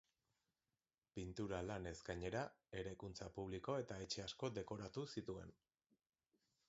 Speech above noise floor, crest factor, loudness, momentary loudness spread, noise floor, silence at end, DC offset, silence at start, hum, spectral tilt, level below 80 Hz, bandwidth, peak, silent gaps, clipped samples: over 41 dB; 20 dB; -49 LUFS; 7 LU; under -90 dBFS; 1.15 s; under 0.1%; 1.15 s; none; -4.5 dB/octave; -66 dBFS; 7.6 kHz; -30 dBFS; none; under 0.1%